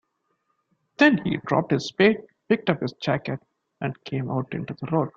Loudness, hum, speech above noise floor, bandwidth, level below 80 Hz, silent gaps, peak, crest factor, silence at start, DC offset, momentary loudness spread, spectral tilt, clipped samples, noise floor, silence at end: -24 LUFS; none; 50 dB; 7.6 kHz; -60 dBFS; none; -4 dBFS; 20 dB; 1 s; under 0.1%; 13 LU; -6.5 dB/octave; under 0.1%; -73 dBFS; 0.1 s